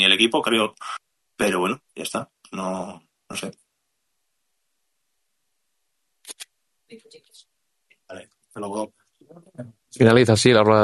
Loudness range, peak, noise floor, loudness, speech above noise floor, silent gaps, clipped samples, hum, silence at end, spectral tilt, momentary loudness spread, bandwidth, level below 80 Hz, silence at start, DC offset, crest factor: 25 LU; -2 dBFS; -77 dBFS; -20 LUFS; 57 dB; none; under 0.1%; none; 0 s; -4.5 dB/octave; 26 LU; 12 kHz; -62 dBFS; 0 s; under 0.1%; 22 dB